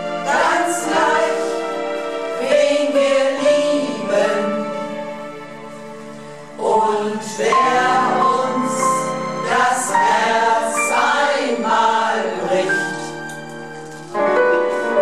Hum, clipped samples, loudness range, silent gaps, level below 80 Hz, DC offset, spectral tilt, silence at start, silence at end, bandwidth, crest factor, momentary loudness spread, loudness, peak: none; under 0.1%; 5 LU; none; -60 dBFS; 0.6%; -3 dB/octave; 0 s; 0 s; 14 kHz; 14 dB; 16 LU; -17 LUFS; -4 dBFS